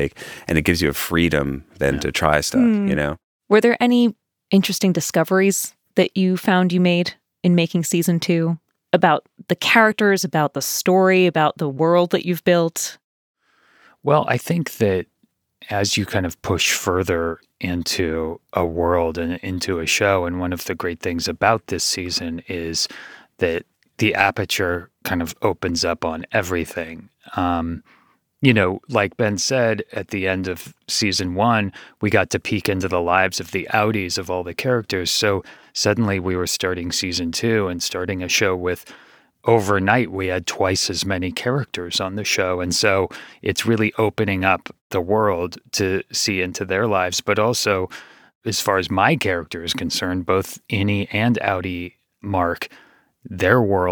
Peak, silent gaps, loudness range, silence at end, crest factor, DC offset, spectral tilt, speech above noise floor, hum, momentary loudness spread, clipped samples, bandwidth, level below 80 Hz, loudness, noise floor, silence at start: 0 dBFS; 3.24-3.40 s, 13.04-13.34 s, 44.81-44.90 s, 48.35-48.41 s; 4 LU; 0 s; 20 dB; under 0.1%; -4.5 dB/octave; 46 dB; none; 9 LU; under 0.1%; over 20 kHz; -50 dBFS; -20 LUFS; -66 dBFS; 0 s